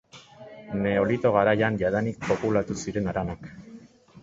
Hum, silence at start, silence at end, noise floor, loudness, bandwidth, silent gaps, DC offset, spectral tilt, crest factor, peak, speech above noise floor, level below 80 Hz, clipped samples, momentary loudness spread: none; 0.15 s; 0.05 s; -49 dBFS; -25 LUFS; 8 kHz; none; under 0.1%; -6.5 dB/octave; 20 dB; -6 dBFS; 24 dB; -52 dBFS; under 0.1%; 23 LU